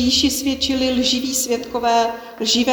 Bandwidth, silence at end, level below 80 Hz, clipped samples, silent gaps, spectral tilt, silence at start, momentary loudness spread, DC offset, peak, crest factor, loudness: over 20 kHz; 0 s; -42 dBFS; under 0.1%; none; -2 dB/octave; 0 s; 5 LU; under 0.1%; -4 dBFS; 14 dB; -18 LUFS